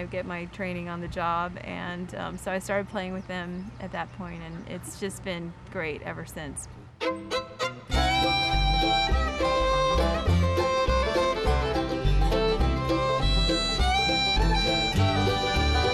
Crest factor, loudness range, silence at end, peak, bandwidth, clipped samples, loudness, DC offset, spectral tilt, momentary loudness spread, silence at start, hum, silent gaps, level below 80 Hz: 14 dB; 11 LU; 0 s; -12 dBFS; 13.5 kHz; under 0.1%; -26 LUFS; under 0.1%; -5 dB/octave; 13 LU; 0 s; none; none; -32 dBFS